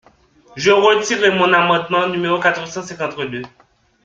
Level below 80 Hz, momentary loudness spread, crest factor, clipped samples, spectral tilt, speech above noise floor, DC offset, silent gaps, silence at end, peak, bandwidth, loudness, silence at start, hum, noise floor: -58 dBFS; 13 LU; 18 dB; under 0.1%; -4 dB/octave; 34 dB; under 0.1%; none; 0.55 s; 0 dBFS; 7.6 kHz; -16 LUFS; 0.55 s; none; -50 dBFS